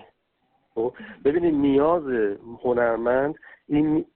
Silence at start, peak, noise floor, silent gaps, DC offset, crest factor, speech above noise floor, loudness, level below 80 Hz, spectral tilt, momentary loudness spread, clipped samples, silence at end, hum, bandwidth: 0.75 s; -8 dBFS; -70 dBFS; none; under 0.1%; 14 dB; 47 dB; -23 LUFS; -52 dBFS; -11.5 dB/octave; 9 LU; under 0.1%; 0.1 s; none; 4.1 kHz